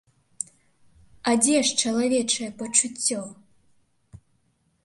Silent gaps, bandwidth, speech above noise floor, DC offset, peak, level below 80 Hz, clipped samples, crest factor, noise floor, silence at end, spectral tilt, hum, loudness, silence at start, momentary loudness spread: none; 11.5 kHz; 45 dB; under 0.1%; -4 dBFS; -66 dBFS; under 0.1%; 22 dB; -68 dBFS; 0.7 s; -1.5 dB/octave; none; -22 LUFS; 0.4 s; 16 LU